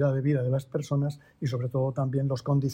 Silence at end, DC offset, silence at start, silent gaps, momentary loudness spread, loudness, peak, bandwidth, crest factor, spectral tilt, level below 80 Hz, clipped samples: 0 s; under 0.1%; 0 s; none; 6 LU; -29 LUFS; -14 dBFS; 8.8 kHz; 14 dB; -8.5 dB/octave; -60 dBFS; under 0.1%